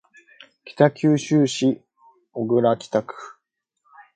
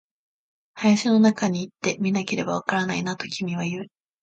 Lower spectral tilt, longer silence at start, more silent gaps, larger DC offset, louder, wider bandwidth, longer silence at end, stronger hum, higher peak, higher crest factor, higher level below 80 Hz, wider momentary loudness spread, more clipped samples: about the same, -6 dB/octave vs -5 dB/octave; about the same, 0.65 s vs 0.75 s; neither; neither; about the same, -21 LUFS vs -23 LUFS; first, 9.4 kHz vs 8.4 kHz; first, 0.85 s vs 0.35 s; neither; first, -2 dBFS vs -6 dBFS; about the same, 20 dB vs 18 dB; about the same, -68 dBFS vs -66 dBFS; first, 20 LU vs 10 LU; neither